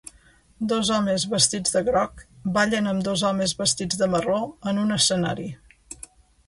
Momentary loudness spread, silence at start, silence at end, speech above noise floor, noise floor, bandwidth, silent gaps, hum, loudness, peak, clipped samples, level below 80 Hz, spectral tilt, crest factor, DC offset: 13 LU; 0.6 s; 0.55 s; 33 dB; -56 dBFS; 11.5 kHz; none; none; -23 LUFS; -6 dBFS; under 0.1%; -52 dBFS; -3.5 dB/octave; 20 dB; under 0.1%